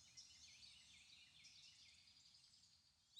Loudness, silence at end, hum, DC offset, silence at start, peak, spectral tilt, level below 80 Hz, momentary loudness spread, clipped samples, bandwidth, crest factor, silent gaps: -64 LUFS; 0 s; none; under 0.1%; 0 s; -48 dBFS; 0.5 dB/octave; under -90 dBFS; 6 LU; under 0.1%; 10.5 kHz; 20 dB; none